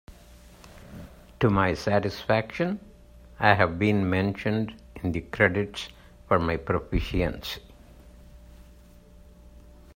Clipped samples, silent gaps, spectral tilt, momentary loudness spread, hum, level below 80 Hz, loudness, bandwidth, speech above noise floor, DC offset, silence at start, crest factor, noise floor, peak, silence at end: under 0.1%; none; -7 dB/octave; 15 LU; none; -44 dBFS; -26 LUFS; 16 kHz; 26 dB; under 0.1%; 0.1 s; 24 dB; -51 dBFS; -4 dBFS; 0.45 s